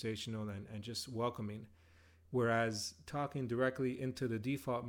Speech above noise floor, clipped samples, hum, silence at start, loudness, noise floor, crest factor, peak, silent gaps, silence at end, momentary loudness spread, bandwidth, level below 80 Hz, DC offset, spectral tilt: 26 dB; under 0.1%; none; 0 s; -39 LUFS; -65 dBFS; 18 dB; -22 dBFS; none; 0 s; 10 LU; 17 kHz; -70 dBFS; under 0.1%; -5.5 dB/octave